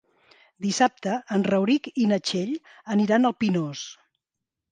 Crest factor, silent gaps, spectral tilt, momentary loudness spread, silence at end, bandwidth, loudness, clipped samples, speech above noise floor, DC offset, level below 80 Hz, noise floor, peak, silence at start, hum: 18 dB; none; -5 dB/octave; 11 LU; 0.8 s; 9.6 kHz; -24 LUFS; under 0.1%; 62 dB; under 0.1%; -70 dBFS; -86 dBFS; -6 dBFS; 0.6 s; none